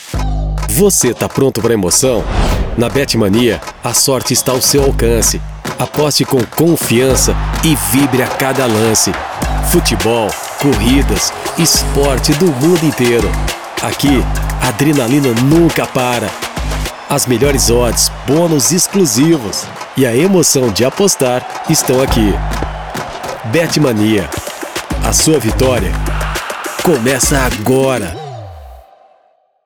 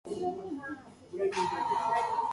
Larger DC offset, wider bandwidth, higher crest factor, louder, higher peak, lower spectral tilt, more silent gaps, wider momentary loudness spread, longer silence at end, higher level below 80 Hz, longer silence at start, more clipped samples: first, 0.2% vs under 0.1%; first, over 20 kHz vs 11.5 kHz; about the same, 12 dB vs 16 dB; first, -12 LUFS vs -32 LUFS; first, 0 dBFS vs -18 dBFS; about the same, -4 dB/octave vs -4.5 dB/octave; neither; second, 9 LU vs 14 LU; first, 0.85 s vs 0 s; first, -22 dBFS vs -66 dBFS; about the same, 0 s vs 0.05 s; neither